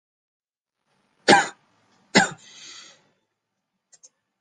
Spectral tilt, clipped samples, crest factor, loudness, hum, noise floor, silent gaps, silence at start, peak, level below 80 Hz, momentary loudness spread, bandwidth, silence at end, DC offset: -3 dB/octave; under 0.1%; 24 dB; -20 LUFS; none; -80 dBFS; none; 1.25 s; -2 dBFS; -70 dBFS; 24 LU; 9.8 kHz; 2.1 s; under 0.1%